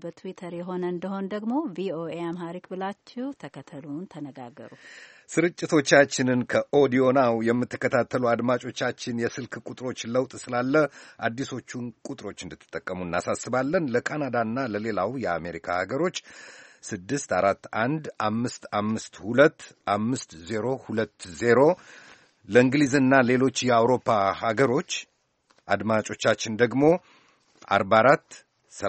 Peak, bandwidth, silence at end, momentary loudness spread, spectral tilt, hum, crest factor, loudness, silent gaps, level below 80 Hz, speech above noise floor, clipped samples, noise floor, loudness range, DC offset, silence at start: -2 dBFS; 8.8 kHz; 0 s; 17 LU; -5 dB/octave; none; 22 dB; -25 LUFS; none; -64 dBFS; 41 dB; under 0.1%; -66 dBFS; 9 LU; under 0.1%; 0.05 s